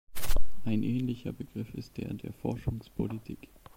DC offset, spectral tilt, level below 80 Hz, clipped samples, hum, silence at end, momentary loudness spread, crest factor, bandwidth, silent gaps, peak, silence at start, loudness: under 0.1%; -6.5 dB/octave; -38 dBFS; under 0.1%; none; 0 s; 9 LU; 16 dB; 16.5 kHz; none; -12 dBFS; 0.05 s; -36 LUFS